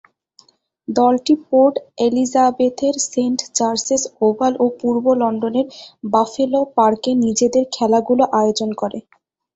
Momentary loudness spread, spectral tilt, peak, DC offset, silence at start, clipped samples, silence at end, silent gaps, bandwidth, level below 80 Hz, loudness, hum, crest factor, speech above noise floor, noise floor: 7 LU; -4 dB/octave; -2 dBFS; under 0.1%; 0.9 s; under 0.1%; 0.55 s; none; 8 kHz; -60 dBFS; -17 LUFS; none; 16 dB; 37 dB; -54 dBFS